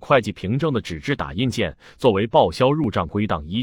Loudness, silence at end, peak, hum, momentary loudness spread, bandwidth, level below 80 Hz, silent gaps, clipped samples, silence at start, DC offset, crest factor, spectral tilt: -21 LUFS; 0 s; -2 dBFS; none; 8 LU; 17 kHz; -46 dBFS; none; under 0.1%; 0 s; under 0.1%; 18 dB; -6.5 dB/octave